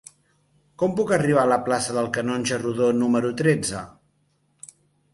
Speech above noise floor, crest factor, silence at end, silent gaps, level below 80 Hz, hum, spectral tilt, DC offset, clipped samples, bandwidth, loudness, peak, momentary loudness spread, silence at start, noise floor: 45 dB; 18 dB; 1.25 s; none; -58 dBFS; none; -5 dB/octave; under 0.1%; under 0.1%; 11.5 kHz; -22 LUFS; -6 dBFS; 7 LU; 0.8 s; -67 dBFS